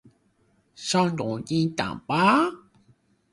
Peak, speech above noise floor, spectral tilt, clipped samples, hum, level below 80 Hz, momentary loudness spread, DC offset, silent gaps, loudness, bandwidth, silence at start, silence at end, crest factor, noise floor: -6 dBFS; 42 dB; -5 dB/octave; under 0.1%; none; -60 dBFS; 10 LU; under 0.1%; none; -24 LUFS; 11.5 kHz; 0.8 s; 0.75 s; 20 dB; -66 dBFS